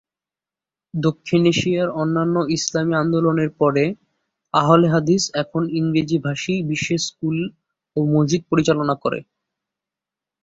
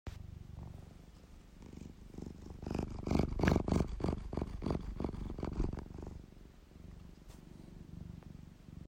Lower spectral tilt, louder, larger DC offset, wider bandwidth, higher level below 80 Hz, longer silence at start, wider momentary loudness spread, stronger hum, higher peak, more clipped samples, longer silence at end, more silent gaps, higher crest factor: second, -5.5 dB/octave vs -7.5 dB/octave; first, -20 LUFS vs -40 LUFS; neither; second, 7.8 kHz vs 16 kHz; second, -56 dBFS vs -46 dBFS; first, 0.95 s vs 0.05 s; second, 7 LU vs 23 LU; neither; first, -2 dBFS vs -16 dBFS; neither; first, 1.2 s vs 0 s; neither; second, 18 dB vs 24 dB